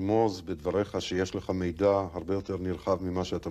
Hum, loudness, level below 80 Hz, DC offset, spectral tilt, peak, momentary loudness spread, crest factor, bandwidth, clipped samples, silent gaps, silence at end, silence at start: none; -30 LUFS; -52 dBFS; under 0.1%; -6.5 dB/octave; -12 dBFS; 6 LU; 16 dB; 14 kHz; under 0.1%; none; 0 s; 0 s